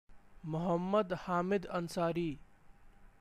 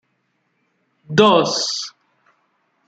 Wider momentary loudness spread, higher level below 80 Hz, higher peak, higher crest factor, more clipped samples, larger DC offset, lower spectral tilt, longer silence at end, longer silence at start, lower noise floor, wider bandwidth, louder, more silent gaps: second, 9 LU vs 13 LU; about the same, -60 dBFS vs -64 dBFS; second, -20 dBFS vs -2 dBFS; about the same, 16 dB vs 20 dB; neither; neither; first, -7 dB/octave vs -4 dB/octave; second, 0.15 s vs 1 s; second, 0.1 s vs 1.1 s; second, -58 dBFS vs -68 dBFS; first, 14.5 kHz vs 9.2 kHz; second, -35 LUFS vs -16 LUFS; neither